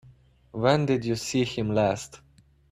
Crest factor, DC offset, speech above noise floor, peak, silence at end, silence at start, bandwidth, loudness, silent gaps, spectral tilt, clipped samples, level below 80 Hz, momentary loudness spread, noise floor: 20 dB; under 0.1%; 30 dB; -8 dBFS; 0.55 s; 0.55 s; 14.5 kHz; -26 LUFS; none; -5.5 dB/octave; under 0.1%; -56 dBFS; 12 LU; -56 dBFS